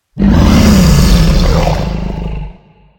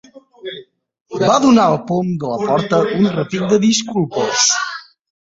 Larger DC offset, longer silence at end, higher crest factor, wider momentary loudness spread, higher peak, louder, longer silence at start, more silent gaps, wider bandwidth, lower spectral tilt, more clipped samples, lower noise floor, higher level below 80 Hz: neither; about the same, 0.45 s vs 0.4 s; second, 10 dB vs 16 dB; second, 15 LU vs 19 LU; about the same, 0 dBFS vs -2 dBFS; first, -10 LUFS vs -15 LUFS; about the same, 0.15 s vs 0.15 s; second, none vs 1.01-1.05 s; first, 17.5 kHz vs 8 kHz; first, -6 dB/octave vs -4 dB/octave; first, 0.6% vs under 0.1%; about the same, -37 dBFS vs -39 dBFS; first, -14 dBFS vs -54 dBFS